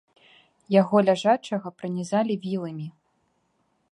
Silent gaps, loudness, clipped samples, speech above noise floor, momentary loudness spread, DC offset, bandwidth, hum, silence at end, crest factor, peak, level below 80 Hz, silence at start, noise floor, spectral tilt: none; -24 LUFS; under 0.1%; 47 dB; 14 LU; under 0.1%; 11 kHz; none; 1 s; 20 dB; -6 dBFS; -74 dBFS; 0.7 s; -70 dBFS; -6.5 dB/octave